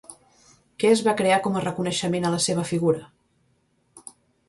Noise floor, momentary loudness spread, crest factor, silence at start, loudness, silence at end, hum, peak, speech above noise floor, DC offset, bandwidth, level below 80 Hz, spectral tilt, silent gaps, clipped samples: -67 dBFS; 14 LU; 18 dB; 0.1 s; -23 LUFS; 0.5 s; none; -6 dBFS; 44 dB; under 0.1%; 11.5 kHz; -62 dBFS; -4.5 dB/octave; none; under 0.1%